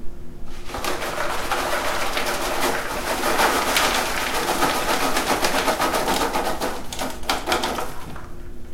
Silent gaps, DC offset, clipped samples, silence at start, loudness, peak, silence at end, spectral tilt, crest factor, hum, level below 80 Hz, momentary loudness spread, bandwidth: none; under 0.1%; under 0.1%; 0 s; -22 LUFS; 0 dBFS; 0 s; -2 dB/octave; 22 dB; none; -36 dBFS; 17 LU; 16.5 kHz